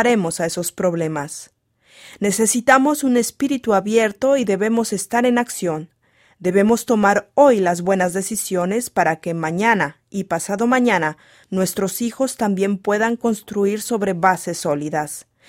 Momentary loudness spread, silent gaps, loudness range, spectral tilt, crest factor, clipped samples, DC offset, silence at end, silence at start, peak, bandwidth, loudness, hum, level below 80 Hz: 9 LU; none; 3 LU; -4.5 dB/octave; 18 dB; under 0.1%; under 0.1%; 0.25 s; 0 s; 0 dBFS; 16.5 kHz; -19 LUFS; none; -60 dBFS